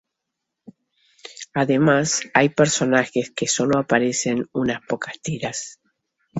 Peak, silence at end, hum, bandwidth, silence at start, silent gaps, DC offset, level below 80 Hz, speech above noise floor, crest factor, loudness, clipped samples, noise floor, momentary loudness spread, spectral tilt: -2 dBFS; 0 s; none; 8.2 kHz; 1.25 s; none; under 0.1%; -58 dBFS; 61 dB; 20 dB; -21 LUFS; under 0.1%; -81 dBFS; 11 LU; -4 dB/octave